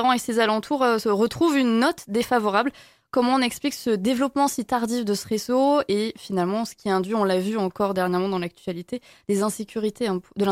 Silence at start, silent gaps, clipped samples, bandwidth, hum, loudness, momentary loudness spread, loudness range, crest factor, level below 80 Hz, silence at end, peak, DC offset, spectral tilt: 0 s; none; under 0.1%; 16.5 kHz; none; -23 LUFS; 7 LU; 3 LU; 16 dB; -62 dBFS; 0 s; -6 dBFS; under 0.1%; -5 dB/octave